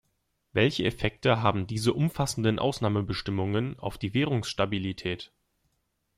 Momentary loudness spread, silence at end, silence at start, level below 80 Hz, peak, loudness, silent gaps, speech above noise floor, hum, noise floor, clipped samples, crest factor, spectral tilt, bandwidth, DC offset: 9 LU; 0.9 s; 0.55 s; -52 dBFS; -10 dBFS; -28 LUFS; none; 48 dB; none; -76 dBFS; under 0.1%; 20 dB; -5.5 dB/octave; 15 kHz; under 0.1%